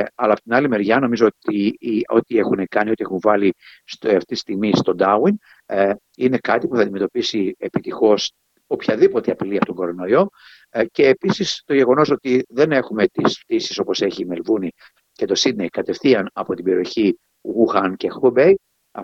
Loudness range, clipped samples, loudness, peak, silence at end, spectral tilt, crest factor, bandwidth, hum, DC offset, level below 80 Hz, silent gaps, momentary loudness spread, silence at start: 3 LU; under 0.1%; -19 LUFS; -2 dBFS; 0 s; -5.5 dB/octave; 18 dB; 7.6 kHz; none; under 0.1%; -62 dBFS; none; 9 LU; 0 s